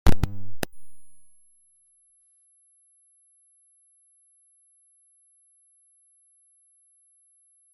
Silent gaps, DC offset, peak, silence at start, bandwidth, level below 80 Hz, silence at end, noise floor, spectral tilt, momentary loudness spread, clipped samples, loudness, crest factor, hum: none; under 0.1%; -2 dBFS; 0.05 s; 16.5 kHz; -38 dBFS; 6.55 s; -63 dBFS; -5.5 dB/octave; 23 LU; under 0.1%; -32 LUFS; 24 dB; none